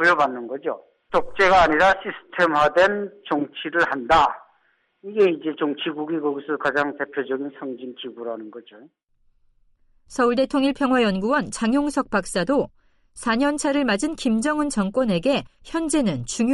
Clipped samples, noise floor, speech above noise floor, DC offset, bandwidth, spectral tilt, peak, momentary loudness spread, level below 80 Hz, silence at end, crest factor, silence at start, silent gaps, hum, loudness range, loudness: under 0.1%; -65 dBFS; 43 dB; under 0.1%; 11.5 kHz; -4.5 dB/octave; -8 dBFS; 14 LU; -48 dBFS; 0 s; 16 dB; 0 s; none; none; 8 LU; -22 LUFS